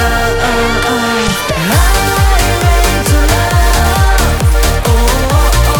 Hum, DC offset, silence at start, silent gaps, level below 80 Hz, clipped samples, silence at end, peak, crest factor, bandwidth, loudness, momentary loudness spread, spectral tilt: none; under 0.1%; 0 s; none; -12 dBFS; under 0.1%; 0 s; 0 dBFS; 10 dB; over 20 kHz; -11 LUFS; 2 LU; -4 dB/octave